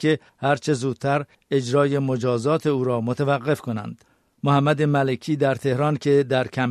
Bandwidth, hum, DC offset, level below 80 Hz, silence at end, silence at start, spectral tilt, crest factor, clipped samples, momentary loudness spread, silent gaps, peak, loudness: 12.5 kHz; none; under 0.1%; -62 dBFS; 0 s; 0 s; -7 dB/octave; 16 dB; under 0.1%; 6 LU; none; -6 dBFS; -22 LUFS